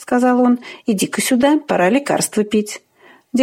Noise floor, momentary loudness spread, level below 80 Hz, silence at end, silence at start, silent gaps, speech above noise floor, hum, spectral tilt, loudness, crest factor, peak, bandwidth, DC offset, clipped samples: -37 dBFS; 8 LU; -60 dBFS; 0 s; 0 s; none; 21 dB; none; -4 dB/octave; -16 LUFS; 14 dB; -2 dBFS; 16.5 kHz; under 0.1%; under 0.1%